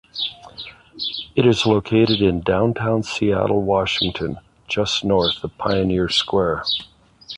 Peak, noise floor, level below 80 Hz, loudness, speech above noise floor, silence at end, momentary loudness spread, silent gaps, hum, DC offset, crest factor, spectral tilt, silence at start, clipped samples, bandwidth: -4 dBFS; -39 dBFS; -42 dBFS; -20 LUFS; 20 dB; 0 s; 11 LU; none; none; under 0.1%; 16 dB; -5.5 dB/octave; 0.15 s; under 0.1%; 11 kHz